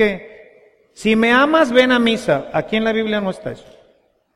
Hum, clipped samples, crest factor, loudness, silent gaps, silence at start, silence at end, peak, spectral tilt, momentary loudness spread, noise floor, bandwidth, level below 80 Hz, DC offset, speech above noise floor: none; under 0.1%; 18 dB; -16 LUFS; none; 0 s; 0.75 s; 0 dBFS; -5 dB/octave; 17 LU; -58 dBFS; 13 kHz; -50 dBFS; under 0.1%; 41 dB